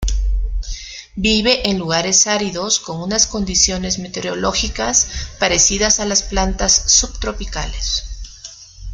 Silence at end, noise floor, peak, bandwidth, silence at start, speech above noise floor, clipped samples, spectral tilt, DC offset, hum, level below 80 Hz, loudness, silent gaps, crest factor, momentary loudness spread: 0 s; -38 dBFS; 0 dBFS; 11 kHz; 0 s; 20 dB; under 0.1%; -2 dB/octave; under 0.1%; none; -26 dBFS; -16 LUFS; none; 18 dB; 16 LU